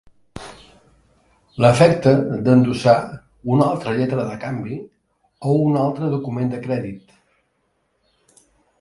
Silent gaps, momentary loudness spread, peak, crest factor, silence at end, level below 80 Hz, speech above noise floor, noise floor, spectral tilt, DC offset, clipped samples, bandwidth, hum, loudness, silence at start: none; 21 LU; 0 dBFS; 20 dB; 1.85 s; -52 dBFS; 50 dB; -68 dBFS; -7.5 dB/octave; under 0.1%; under 0.1%; 11.5 kHz; none; -18 LUFS; 0.35 s